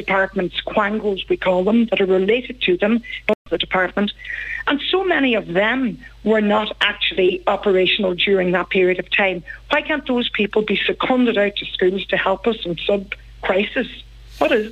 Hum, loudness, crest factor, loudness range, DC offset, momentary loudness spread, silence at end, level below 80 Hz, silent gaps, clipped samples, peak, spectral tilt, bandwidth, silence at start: none; -19 LUFS; 16 dB; 2 LU; under 0.1%; 6 LU; 0 s; -44 dBFS; 3.35-3.45 s; under 0.1%; -4 dBFS; -6.5 dB/octave; 8.2 kHz; 0 s